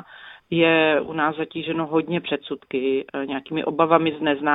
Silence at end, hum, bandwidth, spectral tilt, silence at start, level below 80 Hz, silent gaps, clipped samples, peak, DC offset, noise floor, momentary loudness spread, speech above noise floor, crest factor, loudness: 0 s; none; 4 kHz; -9 dB/octave; 0.1 s; -62 dBFS; none; under 0.1%; -2 dBFS; under 0.1%; -45 dBFS; 10 LU; 23 dB; 20 dB; -22 LUFS